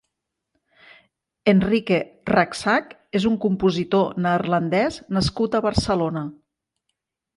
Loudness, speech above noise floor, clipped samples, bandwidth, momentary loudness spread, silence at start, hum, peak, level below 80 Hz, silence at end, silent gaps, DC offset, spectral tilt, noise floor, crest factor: -21 LUFS; 60 dB; under 0.1%; 11.5 kHz; 4 LU; 1.45 s; none; -4 dBFS; -44 dBFS; 1.05 s; none; under 0.1%; -6 dB/octave; -80 dBFS; 18 dB